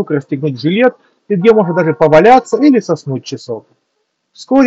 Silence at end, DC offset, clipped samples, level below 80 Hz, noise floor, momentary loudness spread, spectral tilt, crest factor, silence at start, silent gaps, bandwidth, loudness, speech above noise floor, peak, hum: 0 s; under 0.1%; 0.3%; -50 dBFS; -67 dBFS; 15 LU; -7 dB/octave; 12 dB; 0 s; none; 8 kHz; -11 LUFS; 56 dB; 0 dBFS; none